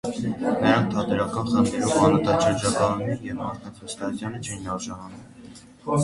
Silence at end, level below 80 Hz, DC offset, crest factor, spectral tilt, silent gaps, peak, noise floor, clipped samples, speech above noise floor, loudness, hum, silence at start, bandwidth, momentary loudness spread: 0 s; -50 dBFS; under 0.1%; 20 dB; -5.5 dB/octave; none; -4 dBFS; -45 dBFS; under 0.1%; 22 dB; -24 LUFS; none; 0.05 s; 11.5 kHz; 17 LU